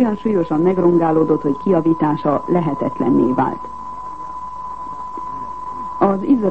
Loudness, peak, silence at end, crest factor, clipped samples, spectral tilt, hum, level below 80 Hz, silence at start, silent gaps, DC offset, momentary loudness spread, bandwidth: -18 LUFS; -2 dBFS; 0 s; 16 dB; under 0.1%; -10 dB/octave; none; -48 dBFS; 0 s; none; 1%; 14 LU; 8 kHz